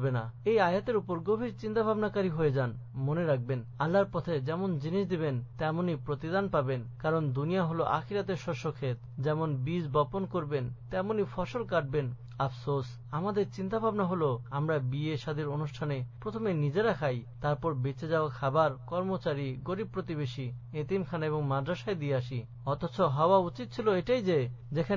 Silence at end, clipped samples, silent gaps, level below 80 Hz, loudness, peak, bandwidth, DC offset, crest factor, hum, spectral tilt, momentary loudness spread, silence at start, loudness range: 0 s; under 0.1%; none; -58 dBFS; -32 LUFS; -12 dBFS; 7.4 kHz; under 0.1%; 18 dB; none; -8 dB/octave; 7 LU; 0 s; 3 LU